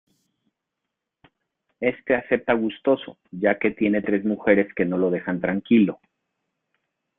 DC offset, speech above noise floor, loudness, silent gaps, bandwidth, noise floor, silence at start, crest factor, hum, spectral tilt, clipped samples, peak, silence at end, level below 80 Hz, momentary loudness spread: under 0.1%; 61 dB; -22 LUFS; none; 3.9 kHz; -83 dBFS; 1.8 s; 22 dB; none; -10 dB/octave; under 0.1%; -2 dBFS; 1.25 s; -62 dBFS; 7 LU